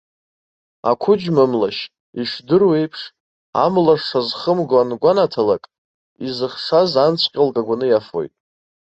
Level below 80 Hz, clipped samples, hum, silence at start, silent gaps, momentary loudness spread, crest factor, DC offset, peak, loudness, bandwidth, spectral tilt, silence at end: -60 dBFS; under 0.1%; none; 0.85 s; 2.00-2.13 s, 3.20-3.53 s, 5.78-6.16 s; 12 LU; 16 dB; under 0.1%; -2 dBFS; -18 LUFS; 8 kHz; -7 dB/octave; 0.65 s